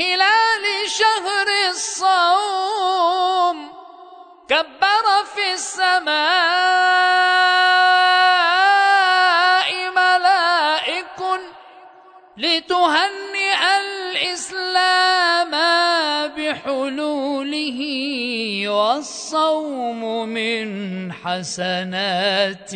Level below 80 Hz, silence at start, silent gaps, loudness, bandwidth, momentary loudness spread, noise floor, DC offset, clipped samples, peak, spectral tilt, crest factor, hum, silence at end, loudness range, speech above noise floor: -68 dBFS; 0 s; none; -17 LUFS; 9.4 kHz; 10 LU; -46 dBFS; under 0.1%; under 0.1%; -4 dBFS; -2 dB/octave; 14 dB; none; 0 s; 8 LU; 26 dB